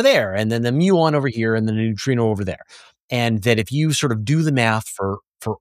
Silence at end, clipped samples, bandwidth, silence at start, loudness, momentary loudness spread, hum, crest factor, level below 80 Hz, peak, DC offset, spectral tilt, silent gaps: 0.05 s; under 0.1%; 15.5 kHz; 0 s; -19 LUFS; 10 LU; none; 18 dB; -56 dBFS; -2 dBFS; under 0.1%; -5.5 dB/octave; 3.02-3.08 s